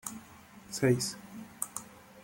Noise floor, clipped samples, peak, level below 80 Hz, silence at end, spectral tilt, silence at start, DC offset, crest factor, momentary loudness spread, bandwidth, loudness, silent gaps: -54 dBFS; under 0.1%; -14 dBFS; -68 dBFS; 0 s; -4.5 dB/octave; 0.05 s; under 0.1%; 22 dB; 24 LU; 17 kHz; -33 LUFS; none